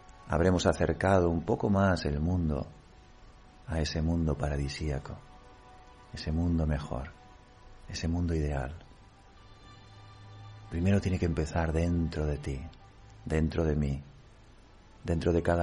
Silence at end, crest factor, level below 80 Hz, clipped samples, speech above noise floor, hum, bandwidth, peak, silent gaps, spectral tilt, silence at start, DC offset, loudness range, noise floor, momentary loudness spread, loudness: 0 s; 20 dB; -40 dBFS; under 0.1%; 26 dB; none; 10.5 kHz; -12 dBFS; none; -7 dB/octave; 0.15 s; under 0.1%; 7 LU; -55 dBFS; 20 LU; -31 LUFS